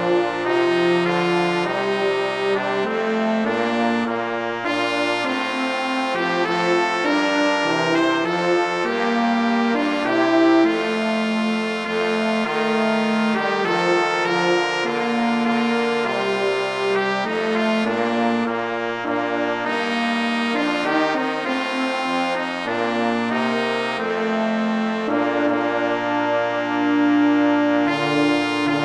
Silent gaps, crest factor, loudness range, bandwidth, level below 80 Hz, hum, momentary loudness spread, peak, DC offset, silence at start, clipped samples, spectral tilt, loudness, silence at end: none; 16 dB; 2 LU; 11 kHz; -66 dBFS; none; 4 LU; -4 dBFS; under 0.1%; 0 s; under 0.1%; -5 dB/octave; -20 LUFS; 0 s